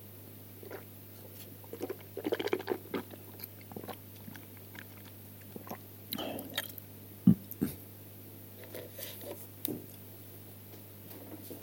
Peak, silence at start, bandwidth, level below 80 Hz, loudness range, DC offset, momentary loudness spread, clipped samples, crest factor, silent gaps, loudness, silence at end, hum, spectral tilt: -10 dBFS; 0 s; 17 kHz; -70 dBFS; 8 LU; under 0.1%; 14 LU; under 0.1%; 30 dB; none; -40 LUFS; 0 s; 50 Hz at -55 dBFS; -6 dB/octave